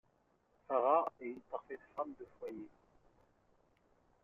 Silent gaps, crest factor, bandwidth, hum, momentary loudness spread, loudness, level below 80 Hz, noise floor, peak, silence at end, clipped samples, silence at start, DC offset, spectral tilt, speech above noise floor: none; 22 dB; 5.6 kHz; none; 17 LU; -38 LUFS; -80 dBFS; -75 dBFS; -18 dBFS; 1.55 s; under 0.1%; 0.7 s; under 0.1%; -4.5 dB/octave; 37 dB